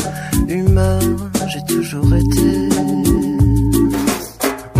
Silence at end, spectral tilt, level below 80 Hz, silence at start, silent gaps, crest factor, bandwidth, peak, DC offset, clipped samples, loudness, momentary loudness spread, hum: 0 s; -6 dB/octave; -24 dBFS; 0 s; none; 14 dB; 15.5 kHz; -2 dBFS; under 0.1%; under 0.1%; -16 LUFS; 6 LU; none